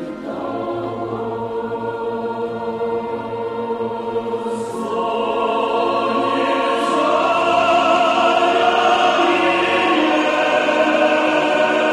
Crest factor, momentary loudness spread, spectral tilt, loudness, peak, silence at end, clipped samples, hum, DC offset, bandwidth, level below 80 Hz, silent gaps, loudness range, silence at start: 14 dB; 10 LU; -4 dB/octave; -18 LUFS; -4 dBFS; 0 s; under 0.1%; none; under 0.1%; 12 kHz; -56 dBFS; none; 9 LU; 0 s